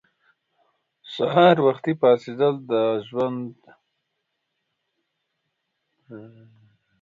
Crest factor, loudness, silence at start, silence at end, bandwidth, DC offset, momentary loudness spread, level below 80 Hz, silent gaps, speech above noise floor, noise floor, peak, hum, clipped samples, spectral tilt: 22 dB; -21 LUFS; 1.05 s; 0.75 s; 7.4 kHz; under 0.1%; 22 LU; -72 dBFS; none; 57 dB; -78 dBFS; -2 dBFS; none; under 0.1%; -8 dB/octave